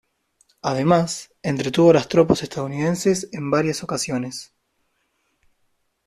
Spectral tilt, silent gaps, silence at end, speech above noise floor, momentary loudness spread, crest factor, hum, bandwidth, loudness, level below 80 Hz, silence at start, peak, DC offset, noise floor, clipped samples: -5.5 dB/octave; none; 1.65 s; 50 dB; 12 LU; 20 dB; none; 13.5 kHz; -20 LUFS; -54 dBFS; 0.65 s; -2 dBFS; under 0.1%; -70 dBFS; under 0.1%